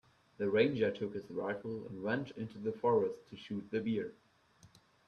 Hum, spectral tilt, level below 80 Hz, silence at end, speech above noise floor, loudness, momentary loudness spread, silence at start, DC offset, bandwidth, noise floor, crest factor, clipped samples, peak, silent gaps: none; -7.5 dB/octave; -74 dBFS; 0.4 s; 30 dB; -36 LUFS; 13 LU; 0.4 s; under 0.1%; 6.8 kHz; -65 dBFS; 20 dB; under 0.1%; -16 dBFS; none